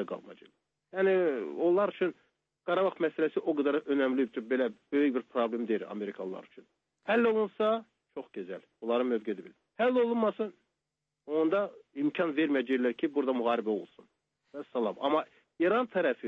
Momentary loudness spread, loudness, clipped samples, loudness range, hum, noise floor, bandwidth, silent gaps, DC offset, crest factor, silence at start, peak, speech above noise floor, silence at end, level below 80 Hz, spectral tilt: 14 LU; -30 LUFS; under 0.1%; 2 LU; none; -87 dBFS; 5.8 kHz; none; under 0.1%; 14 dB; 0 s; -16 dBFS; 57 dB; 0 s; -84 dBFS; -7.5 dB/octave